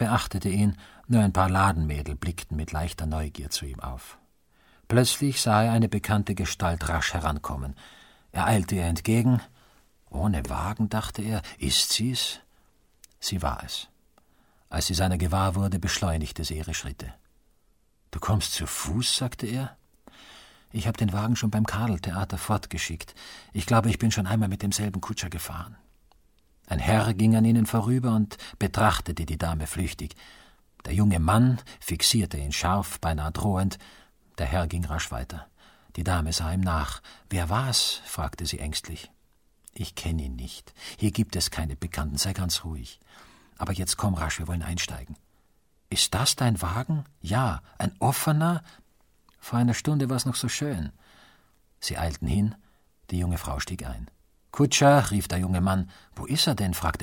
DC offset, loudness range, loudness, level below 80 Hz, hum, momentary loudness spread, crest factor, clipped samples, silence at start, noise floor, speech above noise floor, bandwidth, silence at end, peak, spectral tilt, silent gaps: under 0.1%; 5 LU; -26 LUFS; -40 dBFS; none; 15 LU; 22 dB; under 0.1%; 0 s; -67 dBFS; 41 dB; 17 kHz; 0 s; -6 dBFS; -4.5 dB/octave; none